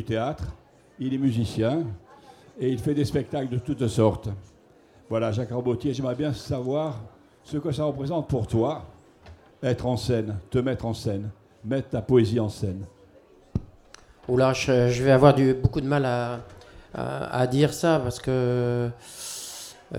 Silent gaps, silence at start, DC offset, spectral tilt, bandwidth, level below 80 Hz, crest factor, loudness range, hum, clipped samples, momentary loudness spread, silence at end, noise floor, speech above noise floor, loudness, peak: none; 0 s; under 0.1%; -6.5 dB/octave; 16 kHz; -48 dBFS; 22 dB; 7 LU; none; under 0.1%; 14 LU; 0 s; -55 dBFS; 31 dB; -25 LUFS; -4 dBFS